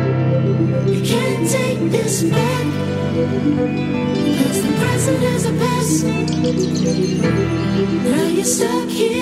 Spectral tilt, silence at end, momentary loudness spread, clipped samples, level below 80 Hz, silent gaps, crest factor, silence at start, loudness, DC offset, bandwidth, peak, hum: -5.5 dB/octave; 0 s; 2 LU; under 0.1%; -44 dBFS; none; 14 dB; 0 s; -17 LUFS; under 0.1%; 16 kHz; -4 dBFS; none